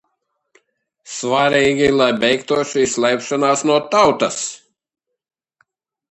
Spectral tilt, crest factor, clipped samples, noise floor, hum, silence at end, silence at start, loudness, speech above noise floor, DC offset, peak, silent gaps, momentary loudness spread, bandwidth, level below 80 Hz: -3.5 dB/octave; 18 dB; under 0.1%; -71 dBFS; none; 1.55 s; 1.05 s; -16 LUFS; 56 dB; under 0.1%; 0 dBFS; none; 8 LU; 10 kHz; -54 dBFS